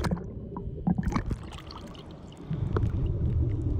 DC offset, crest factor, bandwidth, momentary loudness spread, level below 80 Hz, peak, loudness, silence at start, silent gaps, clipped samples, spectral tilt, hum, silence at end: under 0.1%; 18 dB; 15.5 kHz; 15 LU; -36 dBFS; -12 dBFS; -31 LUFS; 0 s; none; under 0.1%; -8 dB/octave; none; 0 s